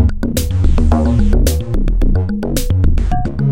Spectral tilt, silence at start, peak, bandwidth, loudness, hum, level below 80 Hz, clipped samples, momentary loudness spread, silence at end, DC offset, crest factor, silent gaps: -6.5 dB/octave; 0 s; 0 dBFS; 16.5 kHz; -16 LUFS; none; -14 dBFS; under 0.1%; 5 LU; 0 s; 5%; 12 dB; none